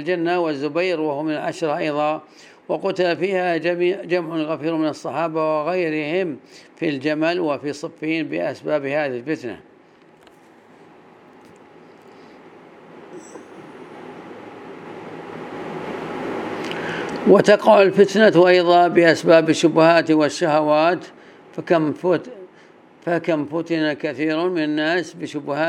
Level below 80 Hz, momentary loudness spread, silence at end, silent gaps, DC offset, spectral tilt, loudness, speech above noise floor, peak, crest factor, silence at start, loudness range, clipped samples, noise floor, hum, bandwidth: -70 dBFS; 23 LU; 0 s; none; under 0.1%; -5.5 dB/octave; -19 LUFS; 32 dB; 0 dBFS; 20 dB; 0 s; 19 LU; under 0.1%; -50 dBFS; none; 11.5 kHz